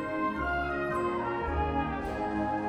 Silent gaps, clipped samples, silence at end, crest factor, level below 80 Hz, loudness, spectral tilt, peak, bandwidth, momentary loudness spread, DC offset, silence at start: none; under 0.1%; 0 s; 14 dB; -42 dBFS; -31 LUFS; -7.5 dB/octave; -18 dBFS; 15.5 kHz; 2 LU; under 0.1%; 0 s